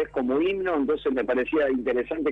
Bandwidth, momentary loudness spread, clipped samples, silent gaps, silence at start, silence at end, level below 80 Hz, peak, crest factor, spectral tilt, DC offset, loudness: 5 kHz; 2 LU; under 0.1%; none; 0 s; 0 s; -52 dBFS; -14 dBFS; 12 dB; -7.5 dB/octave; under 0.1%; -25 LUFS